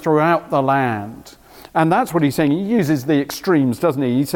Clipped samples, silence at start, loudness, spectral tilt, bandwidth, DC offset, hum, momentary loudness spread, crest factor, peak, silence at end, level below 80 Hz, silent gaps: under 0.1%; 0 s; -18 LUFS; -6.5 dB/octave; 18 kHz; under 0.1%; none; 4 LU; 14 dB; -4 dBFS; 0 s; -54 dBFS; none